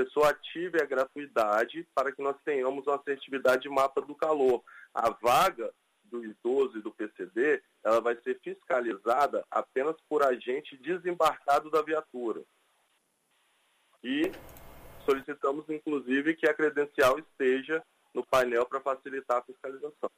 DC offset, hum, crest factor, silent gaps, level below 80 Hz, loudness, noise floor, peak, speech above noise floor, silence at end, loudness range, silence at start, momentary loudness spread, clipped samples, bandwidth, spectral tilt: under 0.1%; none; 18 dB; none; -64 dBFS; -30 LUFS; -73 dBFS; -12 dBFS; 44 dB; 0.1 s; 5 LU; 0 s; 12 LU; under 0.1%; 15.5 kHz; -4 dB/octave